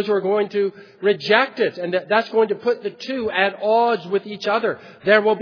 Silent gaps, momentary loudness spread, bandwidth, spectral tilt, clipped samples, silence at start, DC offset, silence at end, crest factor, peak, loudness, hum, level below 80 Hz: none; 9 LU; 5.4 kHz; -5.5 dB/octave; under 0.1%; 0 s; under 0.1%; 0 s; 20 dB; 0 dBFS; -20 LUFS; none; -66 dBFS